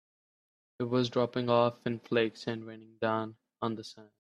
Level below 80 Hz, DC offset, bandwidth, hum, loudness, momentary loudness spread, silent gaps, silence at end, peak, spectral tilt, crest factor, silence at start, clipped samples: -74 dBFS; under 0.1%; 10.5 kHz; none; -32 LUFS; 14 LU; none; 0.15 s; -12 dBFS; -6.5 dB/octave; 20 dB; 0.8 s; under 0.1%